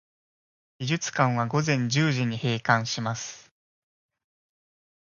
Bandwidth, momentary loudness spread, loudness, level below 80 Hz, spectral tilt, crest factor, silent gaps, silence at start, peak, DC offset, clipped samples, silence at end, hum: 7.2 kHz; 9 LU; -26 LUFS; -66 dBFS; -5 dB/octave; 24 dB; none; 0.8 s; -4 dBFS; under 0.1%; under 0.1%; 1.6 s; none